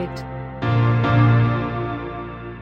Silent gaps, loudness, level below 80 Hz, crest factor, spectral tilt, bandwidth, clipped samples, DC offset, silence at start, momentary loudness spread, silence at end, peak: none; -19 LUFS; -40 dBFS; 14 dB; -9 dB/octave; 5.6 kHz; under 0.1%; under 0.1%; 0 s; 16 LU; 0 s; -6 dBFS